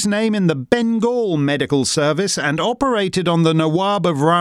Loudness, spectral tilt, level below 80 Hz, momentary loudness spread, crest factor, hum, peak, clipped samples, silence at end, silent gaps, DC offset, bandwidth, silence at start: -17 LUFS; -5 dB/octave; -52 dBFS; 3 LU; 16 dB; none; 0 dBFS; under 0.1%; 0 s; none; under 0.1%; 13.5 kHz; 0 s